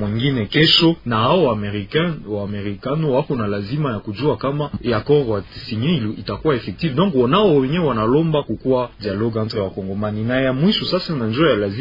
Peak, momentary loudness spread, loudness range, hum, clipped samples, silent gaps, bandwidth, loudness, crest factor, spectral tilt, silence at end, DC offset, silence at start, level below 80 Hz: 0 dBFS; 9 LU; 3 LU; none; under 0.1%; none; 5.4 kHz; -19 LUFS; 18 dB; -7.5 dB/octave; 0 s; under 0.1%; 0 s; -44 dBFS